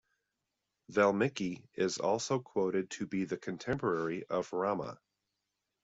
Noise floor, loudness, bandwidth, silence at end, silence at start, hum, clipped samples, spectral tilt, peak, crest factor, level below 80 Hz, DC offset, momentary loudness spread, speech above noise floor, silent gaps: -86 dBFS; -34 LUFS; 8 kHz; 0.9 s; 0.9 s; none; under 0.1%; -5 dB/octave; -14 dBFS; 20 dB; -70 dBFS; under 0.1%; 9 LU; 53 dB; none